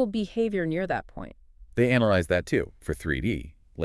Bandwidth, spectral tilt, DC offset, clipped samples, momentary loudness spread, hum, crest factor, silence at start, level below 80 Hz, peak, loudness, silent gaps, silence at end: 12 kHz; -6.5 dB/octave; under 0.1%; under 0.1%; 18 LU; none; 20 dB; 0 s; -46 dBFS; -6 dBFS; -27 LUFS; none; 0 s